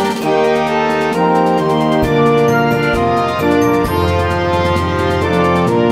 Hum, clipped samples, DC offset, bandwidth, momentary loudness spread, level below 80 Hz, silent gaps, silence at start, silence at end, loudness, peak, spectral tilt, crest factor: none; under 0.1%; 0.3%; 16 kHz; 3 LU; -34 dBFS; none; 0 s; 0 s; -14 LUFS; 0 dBFS; -6.5 dB/octave; 12 dB